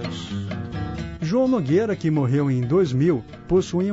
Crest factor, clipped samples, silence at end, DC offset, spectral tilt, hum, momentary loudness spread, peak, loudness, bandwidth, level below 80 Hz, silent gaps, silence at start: 14 dB; under 0.1%; 0 s; under 0.1%; -8 dB/octave; none; 10 LU; -8 dBFS; -22 LUFS; 8 kHz; -44 dBFS; none; 0 s